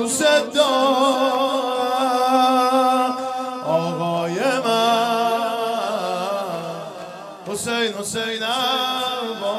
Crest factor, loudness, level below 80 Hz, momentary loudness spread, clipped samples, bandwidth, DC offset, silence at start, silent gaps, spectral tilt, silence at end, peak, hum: 16 dB; -20 LUFS; -68 dBFS; 10 LU; under 0.1%; 16 kHz; under 0.1%; 0 s; none; -3 dB/octave; 0 s; -4 dBFS; none